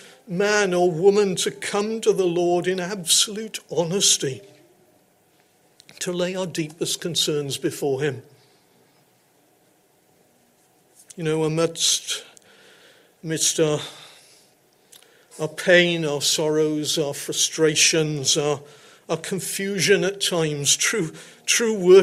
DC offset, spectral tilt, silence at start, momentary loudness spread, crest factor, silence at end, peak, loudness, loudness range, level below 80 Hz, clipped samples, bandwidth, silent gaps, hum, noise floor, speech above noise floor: under 0.1%; -3 dB/octave; 0.25 s; 13 LU; 20 dB; 0 s; -4 dBFS; -21 LUFS; 7 LU; -68 dBFS; under 0.1%; 16 kHz; none; none; -60 dBFS; 39 dB